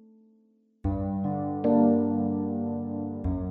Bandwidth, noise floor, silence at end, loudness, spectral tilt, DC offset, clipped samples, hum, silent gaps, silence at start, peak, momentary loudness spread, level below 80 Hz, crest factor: 2.6 kHz; -64 dBFS; 0 s; -27 LUFS; -13 dB/octave; under 0.1%; under 0.1%; none; none; 0.85 s; -12 dBFS; 10 LU; -44 dBFS; 16 dB